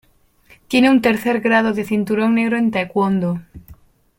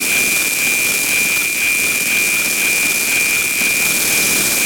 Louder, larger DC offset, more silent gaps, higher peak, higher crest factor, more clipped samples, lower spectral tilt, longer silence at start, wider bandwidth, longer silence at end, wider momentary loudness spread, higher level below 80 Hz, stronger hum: second, -17 LUFS vs -13 LUFS; second, under 0.1% vs 0.3%; neither; about the same, -2 dBFS vs -2 dBFS; about the same, 16 dB vs 14 dB; neither; first, -6.5 dB/octave vs 0.5 dB/octave; first, 0.7 s vs 0 s; second, 16.5 kHz vs over 20 kHz; first, 0.45 s vs 0 s; first, 7 LU vs 1 LU; about the same, -52 dBFS vs -52 dBFS; neither